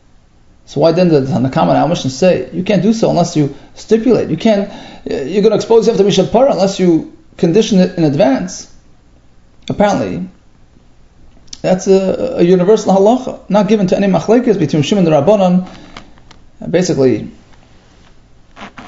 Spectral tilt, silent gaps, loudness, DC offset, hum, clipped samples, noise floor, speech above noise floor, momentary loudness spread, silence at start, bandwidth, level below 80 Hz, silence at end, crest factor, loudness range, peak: -6.5 dB/octave; none; -12 LUFS; under 0.1%; none; under 0.1%; -45 dBFS; 34 dB; 12 LU; 0.7 s; 7.8 kHz; -42 dBFS; 0 s; 12 dB; 6 LU; 0 dBFS